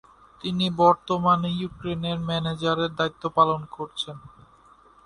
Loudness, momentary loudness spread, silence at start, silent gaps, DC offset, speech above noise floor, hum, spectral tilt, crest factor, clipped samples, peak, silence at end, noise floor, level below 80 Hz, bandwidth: -24 LUFS; 13 LU; 0.45 s; none; under 0.1%; 30 dB; none; -6.5 dB/octave; 22 dB; under 0.1%; -4 dBFS; 0.75 s; -55 dBFS; -54 dBFS; 11 kHz